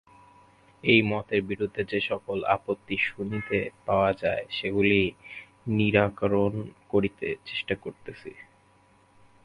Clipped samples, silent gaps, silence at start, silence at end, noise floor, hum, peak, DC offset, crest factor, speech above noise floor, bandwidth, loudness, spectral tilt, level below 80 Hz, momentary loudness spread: under 0.1%; none; 0.85 s; 1 s; -61 dBFS; none; -6 dBFS; under 0.1%; 22 dB; 34 dB; 11 kHz; -27 LUFS; -7.5 dB/octave; -54 dBFS; 15 LU